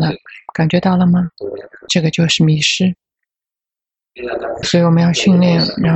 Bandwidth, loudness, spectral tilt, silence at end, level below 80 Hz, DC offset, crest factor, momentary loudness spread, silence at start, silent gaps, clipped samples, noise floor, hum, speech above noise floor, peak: 8.4 kHz; -14 LUFS; -5.5 dB/octave; 0 s; -46 dBFS; under 0.1%; 14 dB; 16 LU; 0 s; none; under 0.1%; -88 dBFS; none; 75 dB; -2 dBFS